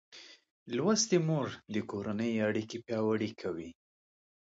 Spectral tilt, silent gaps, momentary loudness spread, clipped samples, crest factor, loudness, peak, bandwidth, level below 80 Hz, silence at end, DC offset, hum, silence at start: -4.5 dB/octave; 0.50-0.66 s; 13 LU; under 0.1%; 18 dB; -33 LUFS; -16 dBFS; 8 kHz; -70 dBFS; 0.8 s; under 0.1%; none; 0.1 s